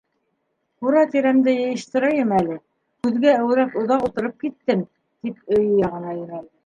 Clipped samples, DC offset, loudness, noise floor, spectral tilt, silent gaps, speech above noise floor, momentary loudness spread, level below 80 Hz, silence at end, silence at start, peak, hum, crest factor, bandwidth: under 0.1%; under 0.1%; -20 LUFS; -72 dBFS; -7 dB/octave; none; 53 dB; 14 LU; -60 dBFS; 0.2 s; 0.8 s; -4 dBFS; none; 16 dB; 9.4 kHz